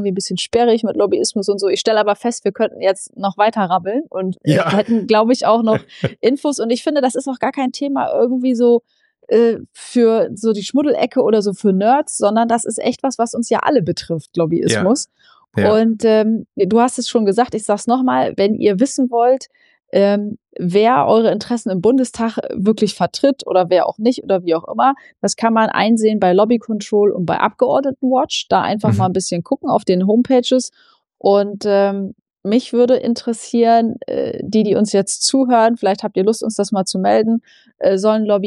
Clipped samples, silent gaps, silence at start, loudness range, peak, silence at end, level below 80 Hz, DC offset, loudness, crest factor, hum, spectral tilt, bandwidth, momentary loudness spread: under 0.1%; 32.22-32.26 s; 0 s; 2 LU; -2 dBFS; 0 s; -60 dBFS; under 0.1%; -16 LUFS; 14 dB; none; -5 dB/octave; 11.5 kHz; 7 LU